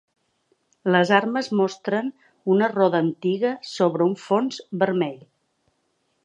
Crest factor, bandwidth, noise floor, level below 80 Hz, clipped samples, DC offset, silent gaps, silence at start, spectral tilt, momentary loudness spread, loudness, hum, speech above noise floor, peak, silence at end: 22 dB; 9 kHz; -71 dBFS; -76 dBFS; under 0.1%; under 0.1%; none; 0.85 s; -6.5 dB/octave; 9 LU; -22 LUFS; none; 49 dB; -2 dBFS; 1.1 s